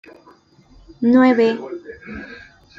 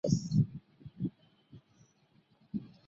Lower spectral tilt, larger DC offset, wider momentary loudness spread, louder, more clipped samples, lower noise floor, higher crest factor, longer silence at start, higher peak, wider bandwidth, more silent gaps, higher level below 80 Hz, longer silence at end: about the same, -7 dB/octave vs -8 dB/octave; neither; first, 21 LU vs 18 LU; first, -16 LUFS vs -35 LUFS; neither; second, -50 dBFS vs -69 dBFS; second, 16 dB vs 22 dB; first, 1 s vs 0.05 s; first, -4 dBFS vs -14 dBFS; second, 7 kHz vs 7.8 kHz; neither; first, -54 dBFS vs -62 dBFS; first, 0.45 s vs 0.2 s